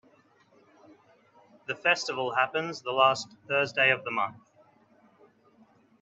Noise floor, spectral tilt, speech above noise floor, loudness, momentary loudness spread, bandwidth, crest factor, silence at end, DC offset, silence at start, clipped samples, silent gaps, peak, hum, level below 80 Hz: -62 dBFS; -3 dB/octave; 35 dB; -27 LUFS; 11 LU; 8.4 kHz; 22 dB; 1.65 s; under 0.1%; 1.7 s; under 0.1%; none; -10 dBFS; none; -80 dBFS